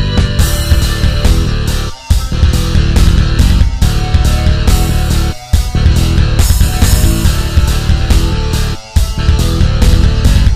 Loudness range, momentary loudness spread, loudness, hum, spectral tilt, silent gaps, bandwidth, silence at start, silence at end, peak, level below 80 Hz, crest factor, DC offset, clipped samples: 1 LU; 5 LU; -12 LUFS; none; -5 dB/octave; none; 16 kHz; 0 s; 0 s; 0 dBFS; -12 dBFS; 10 dB; 1%; 0.9%